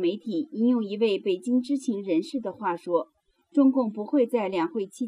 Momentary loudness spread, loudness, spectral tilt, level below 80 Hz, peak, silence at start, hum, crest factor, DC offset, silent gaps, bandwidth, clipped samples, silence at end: 8 LU; -26 LUFS; -6 dB/octave; -78 dBFS; -10 dBFS; 0 s; none; 16 dB; under 0.1%; none; 11 kHz; under 0.1%; 0 s